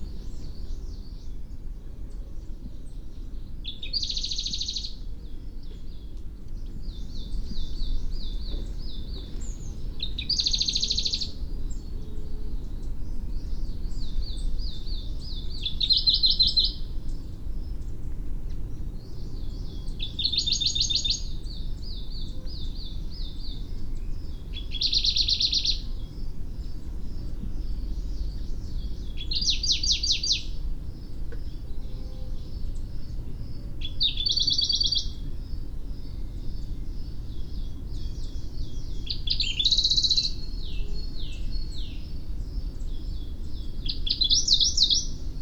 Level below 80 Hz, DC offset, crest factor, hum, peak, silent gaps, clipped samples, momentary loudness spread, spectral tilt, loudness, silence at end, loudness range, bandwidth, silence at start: -32 dBFS; under 0.1%; 22 dB; none; -6 dBFS; none; under 0.1%; 19 LU; -2 dB/octave; -27 LUFS; 0 s; 14 LU; 8.4 kHz; 0 s